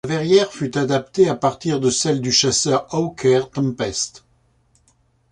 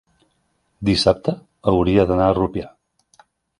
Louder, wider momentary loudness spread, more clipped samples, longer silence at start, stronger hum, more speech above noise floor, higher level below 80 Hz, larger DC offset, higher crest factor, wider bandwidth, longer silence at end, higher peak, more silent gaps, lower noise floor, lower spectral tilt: about the same, -19 LUFS vs -19 LUFS; second, 7 LU vs 10 LU; neither; second, 0.05 s vs 0.8 s; neither; second, 42 dB vs 50 dB; second, -52 dBFS vs -38 dBFS; neither; about the same, 16 dB vs 20 dB; about the same, 11 kHz vs 11.5 kHz; first, 1.25 s vs 0.9 s; about the same, -2 dBFS vs 0 dBFS; neither; second, -60 dBFS vs -67 dBFS; second, -4 dB/octave vs -6.5 dB/octave